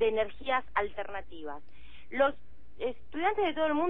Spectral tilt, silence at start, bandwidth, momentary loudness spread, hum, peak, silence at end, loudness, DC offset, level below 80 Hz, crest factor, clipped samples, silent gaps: -7.5 dB/octave; 0 s; 4.2 kHz; 14 LU; none; -14 dBFS; 0 s; -32 LUFS; 1%; -56 dBFS; 18 dB; under 0.1%; none